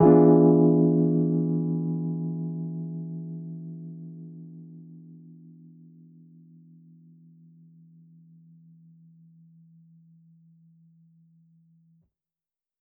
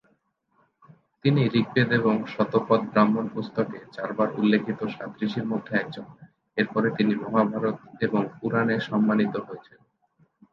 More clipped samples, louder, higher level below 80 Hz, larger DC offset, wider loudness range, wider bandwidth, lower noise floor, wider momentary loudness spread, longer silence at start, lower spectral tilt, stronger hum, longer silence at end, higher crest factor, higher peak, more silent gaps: neither; about the same, -23 LUFS vs -25 LUFS; about the same, -66 dBFS vs -66 dBFS; neither; first, 28 LU vs 3 LU; second, 2.2 kHz vs 5.8 kHz; first, under -90 dBFS vs -69 dBFS; first, 28 LU vs 10 LU; second, 0 s vs 1.25 s; first, -10.5 dB/octave vs -8.5 dB/octave; neither; first, 7.8 s vs 0.9 s; about the same, 22 dB vs 20 dB; about the same, -6 dBFS vs -6 dBFS; neither